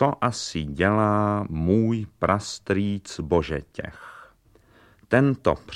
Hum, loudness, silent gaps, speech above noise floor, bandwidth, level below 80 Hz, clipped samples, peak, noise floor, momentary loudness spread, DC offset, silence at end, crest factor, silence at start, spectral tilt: none; -24 LUFS; none; 34 dB; 11.5 kHz; -44 dBFS; under 0.1%; -4 dBFS; -57 dBFS; 13 LU; under 0.1%; 0 s; 20 dB; 0 s; -6.5 dB/octave